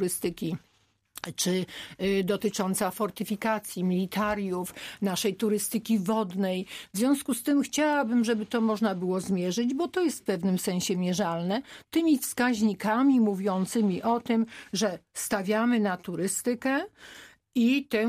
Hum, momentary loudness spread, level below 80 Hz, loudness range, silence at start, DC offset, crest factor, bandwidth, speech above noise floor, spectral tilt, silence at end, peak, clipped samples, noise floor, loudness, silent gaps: none; 8 LU; -64 dBFS; 3 LU; 0 s; under 0.1%; 14 dB; 15.5 kHz; 24 dB; -5 dB/octave; 0 s; -12 dBFS; under 0.1%; -51 dBFS; -28 LUFS; none